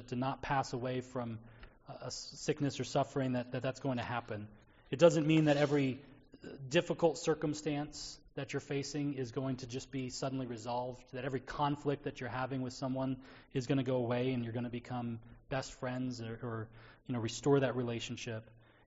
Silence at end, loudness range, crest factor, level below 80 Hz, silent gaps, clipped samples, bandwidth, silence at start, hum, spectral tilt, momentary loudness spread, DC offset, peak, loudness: 0.45 s; 7 LU; 24 dB; -64 dBFS; none; under 0.1%; 8 kHz; 0 s; none; -5.5 dB/octave; 14 LU; under 0.1%; -12 dBFS; -36 LUFS